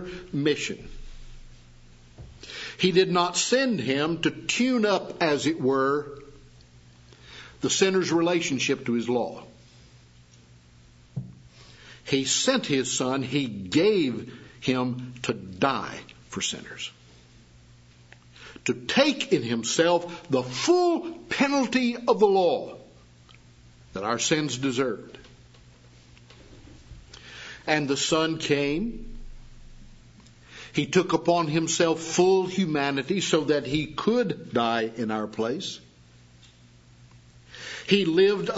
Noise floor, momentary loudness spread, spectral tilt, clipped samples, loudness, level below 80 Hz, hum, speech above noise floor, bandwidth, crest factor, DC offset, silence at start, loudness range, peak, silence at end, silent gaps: -54 dBFS; 18 LU; -4 dB/octave; under 0.1%; -25 LUFS; -52 dBFS; none; 29 dB; 8 kHz; 22 dB; under 0.1%; 0 s; 7 LU; -6 dBFS; 0 s; none